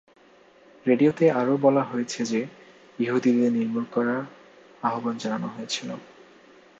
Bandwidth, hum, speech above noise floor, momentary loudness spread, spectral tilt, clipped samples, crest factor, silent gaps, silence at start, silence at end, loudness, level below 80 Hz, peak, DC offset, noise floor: 8 kHz; none; 31 dB; 10 LU; -5.5 dB/octave; under 0.1%; 18 dB; none; 0.85 s; 0.75 s; -25 LUFS; -74 dBFS; -6 dBFS; under 0.1%; -55 dBFS